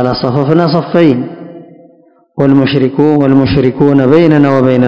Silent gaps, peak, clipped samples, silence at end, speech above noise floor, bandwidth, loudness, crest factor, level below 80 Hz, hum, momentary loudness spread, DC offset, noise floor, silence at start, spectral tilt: none; 0 dBFS; 3%; 0 s; 37 dB; 6.4 kHz; -9 LUFS; 10 dB; -38 dBFS; none; 7 LU; under 0.1%; -45 dBFS; 0 s; -9 dB/octave